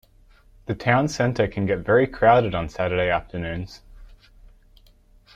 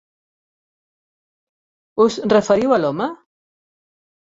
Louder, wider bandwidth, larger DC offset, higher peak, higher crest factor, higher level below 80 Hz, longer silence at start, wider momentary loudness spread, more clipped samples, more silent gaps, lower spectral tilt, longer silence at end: second, -22 LUFS vs -17 LUFS; first, 13.5 kHz vs 7.8 kHz; neither; about the same, -4 dBFS vs -2 dBFS; about the same, 20 dB vs 20 dB; first, -44 dBFS vs -60 dBFS; second, 0.7 s vs 1.95 s; first, 15 LU vs 11 LU; neither; neither; about the same, -6.5 dB/octave vs -5.5 dB/octave; about the same, 1.3 s vs 1.2 s